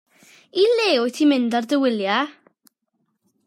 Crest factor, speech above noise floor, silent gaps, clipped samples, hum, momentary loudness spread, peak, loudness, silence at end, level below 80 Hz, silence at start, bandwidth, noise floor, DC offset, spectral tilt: 14 dB; 53 dB; none; under 0.1%; none; 6 LU; -8 dBFS; -20 LUFS; 1.15 s; -76 dBFS; 0.55 s; 13 kHz; -72 dBFS; under 0.1%; -4 dB/octave